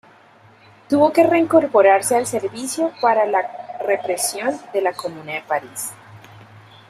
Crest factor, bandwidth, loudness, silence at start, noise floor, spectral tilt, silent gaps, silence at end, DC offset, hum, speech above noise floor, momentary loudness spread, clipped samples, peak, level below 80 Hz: 18 dB; 15.5 kHz; -19 LUFS; 0.9 s; -49 dBFS; -3.5 dB/octave; none; 0.7 s; under 0.1%; none; 31 dB; 15 LU; under 0.1%; -2 dBFS; -64 dBFS